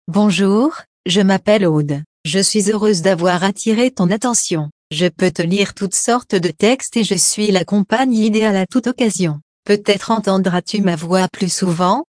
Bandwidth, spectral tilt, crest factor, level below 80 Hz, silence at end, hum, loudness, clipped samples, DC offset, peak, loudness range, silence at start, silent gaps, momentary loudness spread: 10.5 kHz; -4.5 dB/octave; 16 dB; -56 dBFS; 0.1 s; none; -16 LUFS; under 0.1%; under 0.1%; 0 dBFS; 1 LU; 0.1 s; 0.87-1.04 s, 2.06-2.24 s, 4.72-4.90 s, 9.42-9.63 s; 5 LU